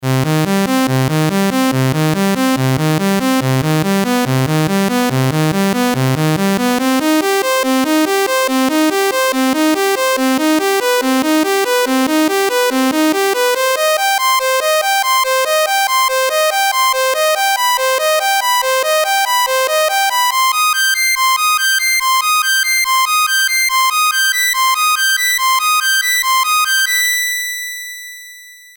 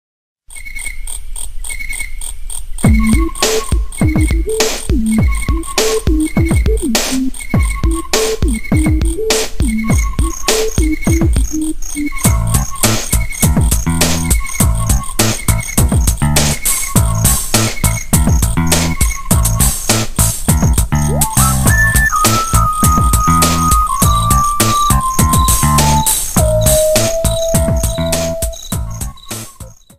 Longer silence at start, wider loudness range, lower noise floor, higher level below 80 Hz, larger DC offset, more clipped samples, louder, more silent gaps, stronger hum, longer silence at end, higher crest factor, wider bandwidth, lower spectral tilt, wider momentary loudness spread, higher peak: second, 0 s vs 0.5 s; about the same, 3 LU vs 4 LU; about the same, -37 dBFS vs -34 dBFS; second, -52 dBFS vs -18 dBFS; neither; neither; about the same, -13 LUFS vs -13 LUFS; neither; neither; about the same, 0.2 s vs 0.25 s; about the same, 10 dB vs 12 dB; first, over 20 kHz vs 16.5 kHz; about the same, -3.5 dB/octave vs -4 dB/octave; second, 3 LU vs 11 LU; second, -4 dBFS vs 0 dBFS